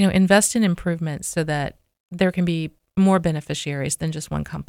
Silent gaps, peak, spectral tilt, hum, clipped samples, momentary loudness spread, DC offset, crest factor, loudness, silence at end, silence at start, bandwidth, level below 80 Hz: 2.00-2.08 s; -2 dBFS; -5 dB/octave; none; under 0.1%; 12 LU; under 0.1%; 20 dB; -21 LUFS; 0.05 s; 0 s; 16 kHz; -46 dBFS